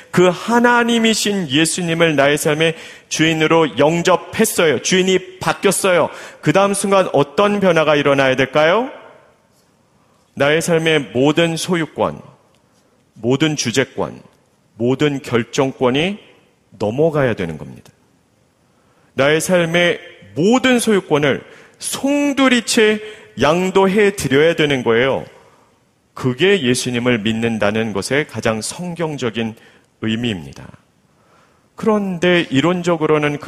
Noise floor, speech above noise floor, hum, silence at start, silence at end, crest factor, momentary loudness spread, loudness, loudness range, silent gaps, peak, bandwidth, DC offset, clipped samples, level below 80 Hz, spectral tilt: -57 dBFS; 41 dB; none; 0 s; 0 s; 16 dB; 10 LU; -16 LUFS; 6 LU; none; 0 dBFS; 15.5 kHz; under 0.1%; under 0.1%; -52 dBFS; -4.5 dB/octave